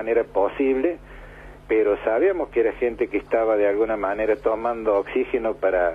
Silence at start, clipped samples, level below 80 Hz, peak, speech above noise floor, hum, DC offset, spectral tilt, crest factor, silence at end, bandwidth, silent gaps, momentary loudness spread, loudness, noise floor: 0 s; under 0.1%; -46 dBFS; -8 dBFS; 20 dB; none; under 0.1%; -7.5 dB/octave; 14 dB; 0 s; 4.9 kHz; none; 4 LU; -22 LUFS; -42 dBFS